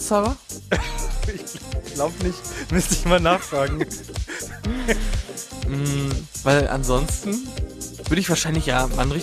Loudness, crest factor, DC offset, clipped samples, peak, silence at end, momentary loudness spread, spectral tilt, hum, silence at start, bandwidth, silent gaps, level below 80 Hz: -23 LUFS; 18 dB; under 0.1%; under 0.1%; -4 dBFS; 0 s; 12 LU; -4.5 dB/octave; none; 0 s; 15.5 kHz; none; -30 dBFS